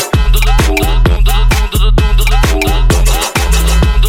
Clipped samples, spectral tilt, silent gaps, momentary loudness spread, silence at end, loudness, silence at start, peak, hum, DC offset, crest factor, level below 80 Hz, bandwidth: under 0.1%; -4.5 dB/octave; none; 1 LU; 0 s; -12 LUFS; 0 s; 0 dBFS; none; under 0.1%; 8 dB; -10 dBFS; 16.5 kHz